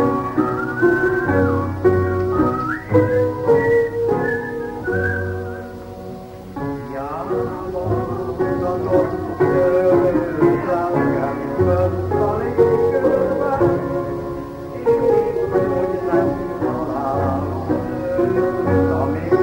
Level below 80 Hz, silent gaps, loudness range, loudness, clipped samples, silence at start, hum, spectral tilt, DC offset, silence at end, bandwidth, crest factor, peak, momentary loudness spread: -42 dBFS; none; 7 LU; -19 LUFS; under 0.1%; 0 s; none; -9 dB/octave; under 0.1%; 0 s; 16.5 kHz; 16 dB; -2 dBFS; 10 LU